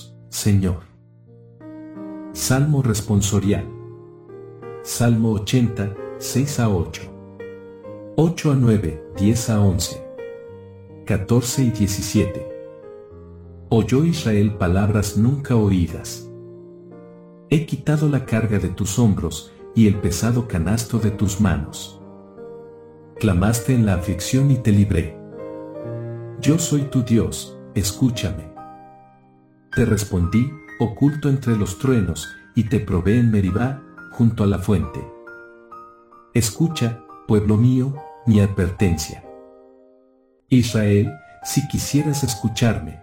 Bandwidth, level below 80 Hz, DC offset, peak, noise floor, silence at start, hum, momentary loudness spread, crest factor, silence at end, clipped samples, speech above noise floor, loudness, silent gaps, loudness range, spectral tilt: 16.5 kHz; -40 dBFS; under 0.1%; -4 dBFS; -57 dBFS; 0 s; none; 21 LU; 18 dB; 0 s; under 0.1%; 39 dB; -20 LUFS; none; 3 LU; -6 dB/octave